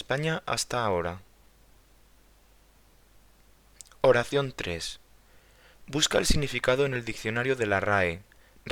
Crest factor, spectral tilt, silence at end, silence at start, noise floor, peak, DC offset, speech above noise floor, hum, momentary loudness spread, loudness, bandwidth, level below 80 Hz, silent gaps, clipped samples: 22 dB; -4 dB/octave; 0 s; 0 s; -59 dBFS; -8 dBFS; under 0.1%; 32 dB; none; 13 LU; -27 LUFS; 19 kHz; -44 dBFS; none; under 0.1%